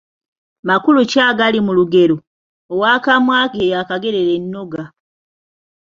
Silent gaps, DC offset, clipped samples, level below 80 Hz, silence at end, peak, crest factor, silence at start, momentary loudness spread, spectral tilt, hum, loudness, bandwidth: 2.27-2.69 s; under 0.1%; under 0.1%; -58 dBFS; 1.1 s; 0 dBFS; 16 dB; 0.65 s; 14 LU; -5.5 dB/octave; none; -14 LUFS; 7.6 kHz